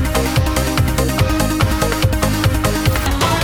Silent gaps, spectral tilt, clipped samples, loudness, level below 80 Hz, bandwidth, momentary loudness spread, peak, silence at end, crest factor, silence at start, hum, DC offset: none; -5 dB/octave; under 0.1%; -16 LUFS; -22 dBFS; over 20 kHz; 1 LU; -2 dBFS; 0 s; 14 dB; 0 s; none; under 0.1%